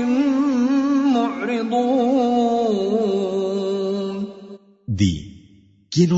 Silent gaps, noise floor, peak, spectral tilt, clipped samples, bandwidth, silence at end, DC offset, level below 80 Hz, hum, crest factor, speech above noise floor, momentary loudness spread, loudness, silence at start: none; -51 dBFS; -4 dBFS; -7 dB/octave; under 0.1%; 8 kHz; 0 s; under 0.1%; -50 dBFS; none; 14 dB; 33 dB; 11 LU; -20 LUFS; 0 s